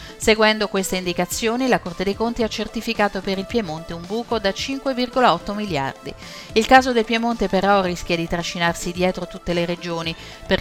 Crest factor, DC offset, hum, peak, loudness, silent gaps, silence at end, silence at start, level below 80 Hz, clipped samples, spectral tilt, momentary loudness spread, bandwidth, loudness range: 20 dB; under 0.1%; none; 0 dBFS; -21 LUFS; none; 0 s; 0 s; -42 dBFS; under 0.1%; -4 dB/octave; 11 LU; 18 kHz; 4 LU